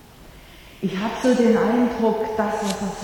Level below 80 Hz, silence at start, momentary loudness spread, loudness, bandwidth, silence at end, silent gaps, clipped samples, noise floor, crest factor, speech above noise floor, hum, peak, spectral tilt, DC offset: -48 dBFS; 0.2 s; 8 LU; -21 LUFS; 18.5 kHz; 0 s; none; under 0.1%; -45 dBFS; 16 dB; 24 dB; none; -6 dBFS; -5.5 dB/octave; under 0.1%